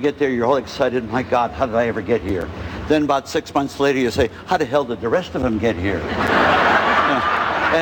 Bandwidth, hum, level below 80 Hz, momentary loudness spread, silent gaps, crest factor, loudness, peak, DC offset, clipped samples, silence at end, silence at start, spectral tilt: 19 kHz; none; -40 dBFS; 7 LU; none; 16 dB; -19 LUFS; -4 dBFS; under 0.1%; under 0.1%; 0 s; 0 s; -5.5 dB/octave